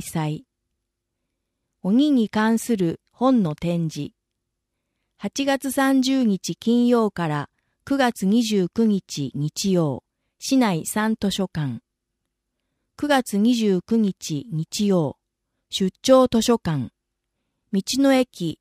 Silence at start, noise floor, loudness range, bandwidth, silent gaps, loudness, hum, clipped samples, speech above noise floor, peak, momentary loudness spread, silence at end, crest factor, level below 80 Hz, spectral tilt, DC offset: 0 s; -80 dBFS; 3 LU; 15.5 kHz; none; -22 LUFS; none; under 0.1%; 59 dB; -2 dBFS; 11 LU; 0.05 s; 20 dB; -56 dBFS; -5.5 dB/octave; under 0.1%